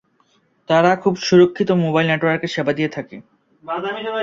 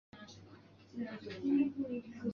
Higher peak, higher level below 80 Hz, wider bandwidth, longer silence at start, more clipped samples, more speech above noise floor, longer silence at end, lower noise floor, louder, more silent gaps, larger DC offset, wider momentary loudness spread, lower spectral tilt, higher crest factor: first, -2 dBFS vs -22 dBFS; first, -60 dBFS vs -72 dBFS; about the same, 7.4 kHz vs 6.8 kHz; first, 0.7 s vs 0.15 s; neither; first, 43 dB vs 22 dB; about the same, 0 s vs 0 s; about the same, -61 dBFS vs -59 dBFS; first, -18 LUFS vs -37 LUFS; neither; neither; second, 12 LU vs 22 LU; about the same, -6 dB/octave vs -6.5 dB/octave; about the same, 16 dB vs 18 dB